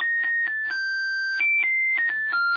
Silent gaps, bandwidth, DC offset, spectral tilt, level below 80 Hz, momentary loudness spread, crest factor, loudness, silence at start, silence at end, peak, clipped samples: none; 5 kHz; under 0.1%; 0.5 dB/octave; -70 dBFS; 6 LU; 8 dB; -22 LUFS; 0 s; 0 s; -16 dBFS; under 0.1%